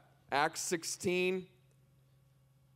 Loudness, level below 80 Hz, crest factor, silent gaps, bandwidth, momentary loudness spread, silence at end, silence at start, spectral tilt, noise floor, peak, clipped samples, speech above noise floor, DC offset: -35 LUFS; -74 dBFS; 22 dB; none; 16 kHz; 4 LU; 1.3 s; 0.3 s; -3.5 dB/octave; -67 dBFS; -16 dBFS; under 0.1%; 33 dB; under 0.1%